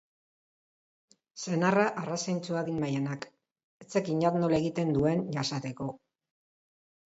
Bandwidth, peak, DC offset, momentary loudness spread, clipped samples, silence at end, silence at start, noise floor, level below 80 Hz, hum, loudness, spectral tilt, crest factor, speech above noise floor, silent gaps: 8 kHz; -12 dBFS; under 0.1%; 13 LU; under 0.1%; 1.15 s; 1.35 s; under -90 dBFS; -62 dBFS; none; -30 LUFS; -6 dB/octave; 20 dB; over 61 dB; 3.64-3.80 s